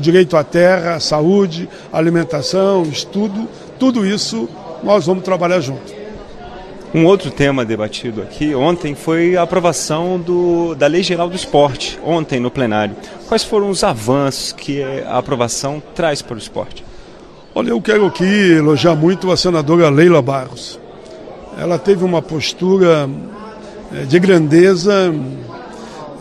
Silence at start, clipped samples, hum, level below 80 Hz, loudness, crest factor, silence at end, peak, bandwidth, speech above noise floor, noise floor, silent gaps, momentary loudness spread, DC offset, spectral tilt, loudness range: 0 s; under 0.1%; none; -44 dBFS; -14 LUFS; 14 dB; 0 s; 0 dBFS; 13 kHz; 24 dB; -37 dBFS; none; 19 LU; under 0.1%; -5.5 dB/octave; 5 LU